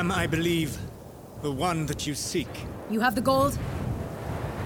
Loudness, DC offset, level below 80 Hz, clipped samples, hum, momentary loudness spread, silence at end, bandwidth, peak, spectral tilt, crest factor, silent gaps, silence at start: -28 LUFS; under 0.1%; -44 dBFS; under 0.1%; none; 14 LU; 0 s; over 20 kHz; -10 dBFS; -5 dB/octave; 18 dB; none; 0 s